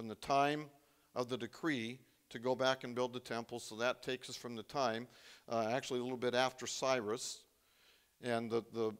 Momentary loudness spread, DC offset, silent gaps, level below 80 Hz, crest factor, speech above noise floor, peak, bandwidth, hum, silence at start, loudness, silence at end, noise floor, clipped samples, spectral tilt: 12 LU; under 0.1%; none; -78 dBFS; 22 dB; 32 dB; -16 dBFS; 16 kHz; none; 0 s; -39 LUFS; 0 s; -70 dBFS; under 0.1%; -4 dB/octave